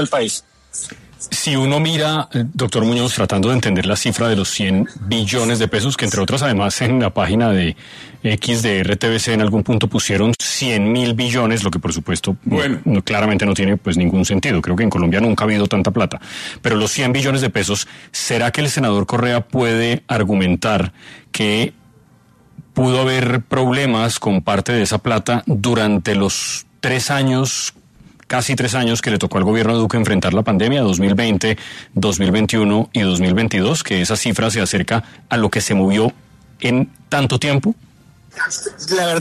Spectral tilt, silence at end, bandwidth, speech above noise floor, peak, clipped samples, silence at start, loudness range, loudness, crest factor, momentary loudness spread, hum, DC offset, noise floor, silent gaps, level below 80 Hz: -4.5 dB/octave; 0 s; 13.5 kHz; 34 dB; -2 dBFS; under 0.1%; 0 s; 2 LU; -17 LUFS; 14 dB; 6 LU; none; under 0.1%; -50 dBFS; none; -44 dBFS